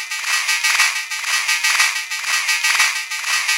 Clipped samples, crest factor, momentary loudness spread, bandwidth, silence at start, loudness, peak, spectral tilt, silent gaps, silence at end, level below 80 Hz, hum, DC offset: under 0.1%; 18 dB; 5 LU; 16.5 kHz; 0 s; -16 LUFS; 0 dBFS; 8.5 dB/octave; none; 0 s; under -90 dBFS; none; under 0.1%